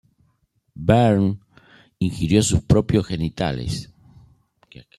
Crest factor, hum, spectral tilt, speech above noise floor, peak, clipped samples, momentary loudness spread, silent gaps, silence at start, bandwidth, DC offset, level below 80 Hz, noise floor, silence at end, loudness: 18 dB; none; -6 dB/octave; 47 dB; -4 dBFS; under 0.1%; 11 LU; none; 0.75 s; 13 kHz; under 0.1%; -40 dBFS; -66 dBFS; 1.15 s; -20 LUFS